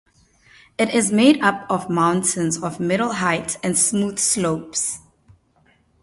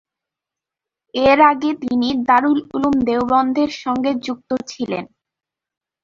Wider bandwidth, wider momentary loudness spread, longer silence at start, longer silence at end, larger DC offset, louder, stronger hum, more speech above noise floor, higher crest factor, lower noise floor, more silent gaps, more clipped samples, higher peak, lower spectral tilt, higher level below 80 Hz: first, 12 kHz vs 7.4 kHz; second, 9 LU vs 12 LU; second, 0.8 s vs 1.15 s; about the same, 1.05 s vs 1 s; neither; about the same, -19 LUFS vs -17 LUFS; neither; second, 40 dB vs 69 dB; about the same, 20 dB vs 16 dB; second, -59 dBFS vs -86 dBFS; neither; neither; about the same, -2 dBFS vs -2 dBFS; second, -3.5 dB/octave vs -5 dB/octave; second, -58 dBFS vs -52 dBFS